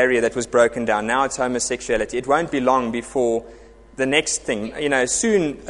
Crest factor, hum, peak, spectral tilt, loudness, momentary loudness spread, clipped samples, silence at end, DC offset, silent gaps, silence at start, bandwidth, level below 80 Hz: 18 dB; none; -2 dBFS; -3 dB/octave; -20 LUFS; 5 LU; under 0.1%; 0 s; under 0.1%; none; 0 s; 11.5 kHz; -48 dBFS